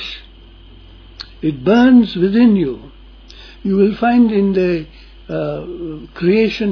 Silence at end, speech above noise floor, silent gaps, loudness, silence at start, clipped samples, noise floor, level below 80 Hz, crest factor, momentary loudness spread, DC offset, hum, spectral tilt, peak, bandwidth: 0 s; 26 dB; none; -14 LUFS; 0 s; under 0.1%; -40 dBFS; -40 dBFS; 14 dB; 18 LU; under 0.1%; none; -8 dB/octave; -2 dBFS; 5.4 kHz